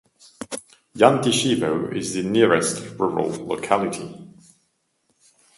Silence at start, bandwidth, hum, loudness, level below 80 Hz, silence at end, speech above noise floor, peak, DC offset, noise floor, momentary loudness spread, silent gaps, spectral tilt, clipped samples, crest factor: 0.4 s; 12 kHz; none; -21 LUFS; -60 dBFS; 1.3 s; 49 dB; 0 dBFS; under 0.1%; -70 dBFS; 18 LU; none; -4.5 dB/octave; under 0.1%; 22 dB